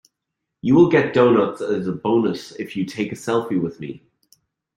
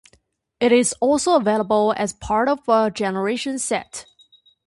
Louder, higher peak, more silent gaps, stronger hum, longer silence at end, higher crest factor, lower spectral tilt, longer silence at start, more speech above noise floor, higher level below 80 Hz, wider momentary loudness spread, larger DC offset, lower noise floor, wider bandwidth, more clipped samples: about the same, -20 LUFS vs -20 LUFS; about the same, -2 dBFS vs -4 dBFS; neither; neither; first, 0.8 s vs 0.65 s; about the same, 18 dB vs 18 dB; first, -7 dB/octave vs -4 dB/octave; about the same, 0.65 s vs 0.6 s; first, 62 dB vs 42 dB; second, -60 dBFS vs -52 dBFS; first, 14 LU vs 8 LU; neither; first, -81 dBFS vs -62 dBFS; about the same, 12 kHz vs 11.5 kHz; neither